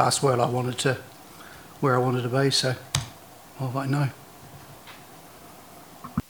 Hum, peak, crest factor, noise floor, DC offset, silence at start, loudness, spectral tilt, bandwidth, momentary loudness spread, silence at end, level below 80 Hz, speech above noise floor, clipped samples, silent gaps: none; -4 dBFS; 24 dB; -47 dBFS; under 0.1%; 0 s; -25 LUFS; -4.5 dB/octave; over 20 kHz; 24 LU; 0.1 s; -56 dBFS; 23 dB; under 0.1%; none